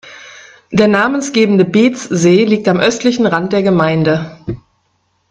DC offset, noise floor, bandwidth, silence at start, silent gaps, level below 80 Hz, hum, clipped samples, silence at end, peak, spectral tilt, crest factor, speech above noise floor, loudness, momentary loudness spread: under 0.1%; -61 dBFS; 9.8 kHz; 0.05 s; none; -48 dBFS; none; under 0.1%; 0.75 s; 0 dBFS; -5.5 dB/octave; 14 dB; 50 dB; -12 LUFS; 16 LU